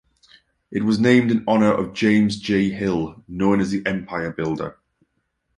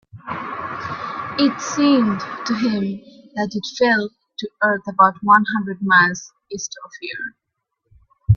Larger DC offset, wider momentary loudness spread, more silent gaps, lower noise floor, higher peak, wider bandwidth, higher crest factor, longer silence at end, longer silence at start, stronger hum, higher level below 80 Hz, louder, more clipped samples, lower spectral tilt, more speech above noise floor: neither; second, 11 LU vs 17 LU; neither; about the same, -72 dBFS vs -75 dBFS; about the same, -2 dBFS vs 0 dBFS; first, 11 kHz vs 7.4 kHz; about the same, 18 dB vs 20 dB; first, 0.85 s vs 0 s; first, 0.7 s vs 0.15 s; neither; second, -52 dBFS vs -46 dBFS; about the same, -20 LUFS vs -19 LUFS; neither; first, -6.5 dB/octave vs -5 dB/octave; about the same, 53 dB vs 56 dB